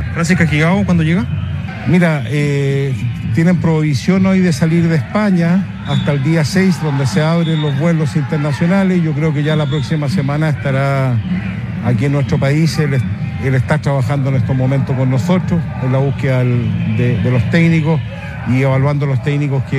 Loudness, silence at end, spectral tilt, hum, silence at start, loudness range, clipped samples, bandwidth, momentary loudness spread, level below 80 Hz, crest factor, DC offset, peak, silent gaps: -15 LUFS; 0 s; -7.5 dB/octave; none; 0 s; 2 LU; under 0.1%; 12.5 kHz; 5 LU; -38 dBFS; 14 dB; under 0.1%; 0 dBFS; none